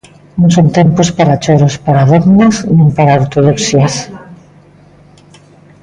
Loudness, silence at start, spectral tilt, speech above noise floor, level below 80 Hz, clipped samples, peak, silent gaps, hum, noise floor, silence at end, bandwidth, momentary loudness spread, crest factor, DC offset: -9 LUFS; 0.35 s; -6.5 dB/octave; 33 dB; -40 dBFS; under 0.1%; 0 dBFS; none; 50 Hz at -30 dBFS; -41 dBFS; 1.5 s; 10 kHz; 5 LU; 10 dB; under 0.1%